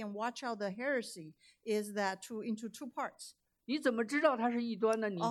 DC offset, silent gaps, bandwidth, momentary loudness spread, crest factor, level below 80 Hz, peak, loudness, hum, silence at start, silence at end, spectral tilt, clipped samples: under 0.1%; none; 13.5 kHz; 17 LU; 20 dB; -88 dBFS; -16 dBFS; -36 LUFS; none; 0 s; 0 s; -4.5 dB/octave; under 0.1%